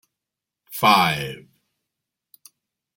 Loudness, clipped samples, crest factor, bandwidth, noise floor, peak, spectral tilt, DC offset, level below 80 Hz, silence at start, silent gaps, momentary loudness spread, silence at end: -18 LUFS; under 0.1%; 24 dB; 17 kHz; -86 dBFS; -2 dBFS; -4 dB/octave; under 0.1%; -62 dBFS; 0.7 s; none; 20 LU; 1.6 s